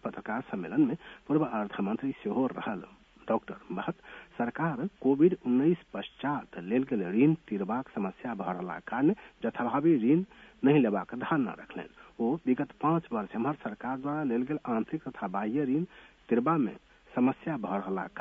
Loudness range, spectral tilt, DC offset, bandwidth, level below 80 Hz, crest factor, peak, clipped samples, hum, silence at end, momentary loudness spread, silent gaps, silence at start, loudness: 4 LU; -9.5 dB/octave; under 0.1%; 3.8 kHz; -66 dBFS; 18 dB; -12 dBFS; under 0.1%; none; 0 s; 11 LU; none; 0.05 s; -31 LUFS